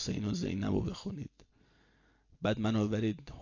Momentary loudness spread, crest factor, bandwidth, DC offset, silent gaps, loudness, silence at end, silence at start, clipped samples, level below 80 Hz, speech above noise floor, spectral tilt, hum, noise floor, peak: 11 LU; 16 dB; 7.4 kHz; under 0.1%; none; -34 LUFS; 0 s; 0 s; under 0.1%; -54 dBFS; 34 dB; -6.5 dB/octave; none; -68 dBFS; -18 dBFS